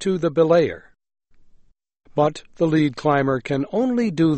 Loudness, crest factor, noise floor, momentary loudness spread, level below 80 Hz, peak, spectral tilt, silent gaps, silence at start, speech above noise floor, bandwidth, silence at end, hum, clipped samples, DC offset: -20 LUFS; 16 dB; -53 dBFS; 7 LU; -54 dBFS; -4 dBFS; -7 dB/octave; none; 0 s; 34 dB; 8.4 kHz; 0 s; none; under 0.1%; under 0.1%